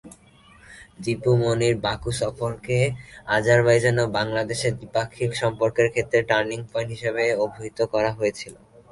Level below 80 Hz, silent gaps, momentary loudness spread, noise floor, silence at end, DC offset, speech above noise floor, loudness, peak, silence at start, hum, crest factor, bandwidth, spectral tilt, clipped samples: -50 dBFS; none; 9 LU; -52 dBFS; 0.35 s; under 0.1%; 30 dB; -23 LUFS; -6 dBFS; 0.05 s; none; 18 dB; 11.5 kHz; -5.5 dB/octave; under 0.1%